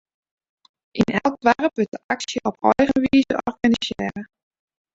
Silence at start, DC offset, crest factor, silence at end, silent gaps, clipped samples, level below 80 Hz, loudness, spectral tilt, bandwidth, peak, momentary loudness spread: 0.95 s; under 0.1%; 20 dB; 0.7 s; 1.88-1.92 s, 2.04-2.09 s; under 0.1%; -52 dBFS; -21 LUFS; -5 dB/octave; 7.8 kHz; -2 dBFS; 9 LU